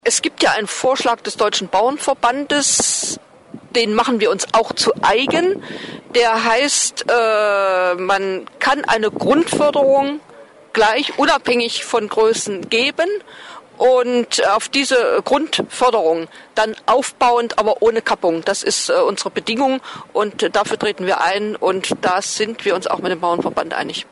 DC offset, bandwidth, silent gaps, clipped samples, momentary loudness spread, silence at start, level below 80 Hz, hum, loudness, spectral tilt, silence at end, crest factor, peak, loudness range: under 0.1%; 11.5 kHz; none; under 0.1%; 7 LU; 0.05 s; -54 dBFS; none; -17 LUFS; -2 dB/octave; 0.1 s; 14 dB; -4 dBFS; 2 LU